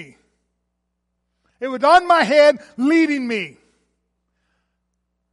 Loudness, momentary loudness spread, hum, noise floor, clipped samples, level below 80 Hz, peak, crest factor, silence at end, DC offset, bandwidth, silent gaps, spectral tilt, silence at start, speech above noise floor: -16 LUFS; 15 LU; 60 Hz at -50 dBFS; -74 dBFS; under 0.1%; -62 dBFS; -2 dBFS; 18 dB; 1.85 s; under 0.1%; 11.5 kHz; none; -4 dB/octave; 0 s; 59 dB